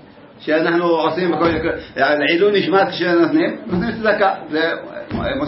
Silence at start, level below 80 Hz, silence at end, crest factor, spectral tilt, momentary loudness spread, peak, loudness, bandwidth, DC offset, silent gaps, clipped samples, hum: 0.25 s; -44 dBFS; 0 s; 14 dB; -9.5 dB/octave; 8 LU; -2 dBFS; -17 LUFS; 5.8 kHz; under 0.1%; none; under 0.1%; none